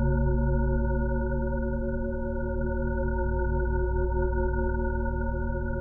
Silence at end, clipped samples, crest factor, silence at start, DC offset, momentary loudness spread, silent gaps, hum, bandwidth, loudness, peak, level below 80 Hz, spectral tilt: 0 s; under 0.1%; 12 dB; 0 s; under 0.1%; 5 LU; none; none; 1.6 kHz; -29 LUFS; -14 dBFS; -28 dBFS; -12 dB/octave